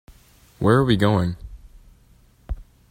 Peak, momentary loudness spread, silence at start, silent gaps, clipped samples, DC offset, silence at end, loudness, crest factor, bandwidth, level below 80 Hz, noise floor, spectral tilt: -4 dBFS; 20 LU; 0.6 s; none; under 0.1%; under 0.1%; 0.3 s; -20 LUFS; 20 dB; 16 kHz; -40 dBFS; -54 dBFS; -7.5 dB/octave